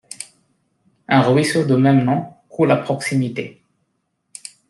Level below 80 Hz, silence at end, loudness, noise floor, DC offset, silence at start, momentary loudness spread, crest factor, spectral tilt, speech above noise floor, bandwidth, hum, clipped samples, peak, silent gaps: -60 dBFS; 1.2 s; -17 LUFS; -71 dBFS; under 0.1%; 0.2 s; 20 LU; 18 dB; -6.5 dB/octave; 54 dB; 12.5 kHz; none; under 0.1%; -2 dBFS; none